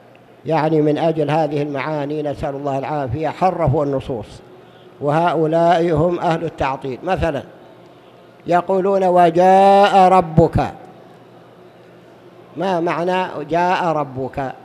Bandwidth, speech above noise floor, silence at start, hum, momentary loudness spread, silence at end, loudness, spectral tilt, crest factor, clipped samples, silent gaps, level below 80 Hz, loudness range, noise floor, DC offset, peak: 12.5 kHz; 28 dB; 0.45 s; none; 13 LU; 0.05 s; -17 LUFS; -7.5 dB/octave; 18 dB; under 0.1%; none; -42 dBFS; 8 LU; -44 dBFS; under 0.1%; 0 dBFS